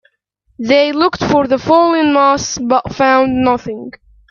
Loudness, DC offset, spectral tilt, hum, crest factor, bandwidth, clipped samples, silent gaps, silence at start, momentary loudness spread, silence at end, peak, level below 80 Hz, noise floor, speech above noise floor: -12 LUFS; under 0.1%; -4.5 dB/octave; none; 14 dB; 7.4 kHz; under 0.1%; none; 0.6 s; 11 LU; 0.4 s; 0 dBFS; -44 dBFS; -61 dBFS; 48 dB